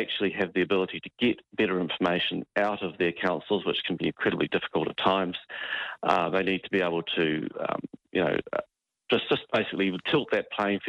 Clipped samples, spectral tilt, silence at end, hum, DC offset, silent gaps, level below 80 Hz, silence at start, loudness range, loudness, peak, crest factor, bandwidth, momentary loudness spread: under 0.1%; -6.5 dB/octave; 0 s; none; under 0.1%; none; -64 dBFS; 0 s; 1 LU; -28 LUFS; -8 dBFS; 20 dB; 8.6 kHz; 6 LU